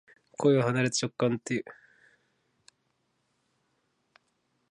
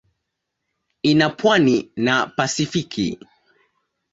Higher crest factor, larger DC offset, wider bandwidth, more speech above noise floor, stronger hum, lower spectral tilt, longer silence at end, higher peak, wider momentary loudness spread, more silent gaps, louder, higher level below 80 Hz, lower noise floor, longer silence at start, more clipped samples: about the same, 20 dB vs 20 dB; neither; first, 11 kHz vs 8 kHz; second, 49 dB vs 60 dB; neither; about the same, -5 dB/octave vs -4.5 dB/octave; first, 2.95 s vs 1 s; second, -12 dBFS vs -2 dBFS; first, 15 LU vs 9 LU; neither; second, -28 LUFS vs -19 LUFS; second, -74 dBFS vs -58 dBFS; about the same, -76 dBFS vs -78 dBFS; second, 0.4 s vs 1.05 s; neither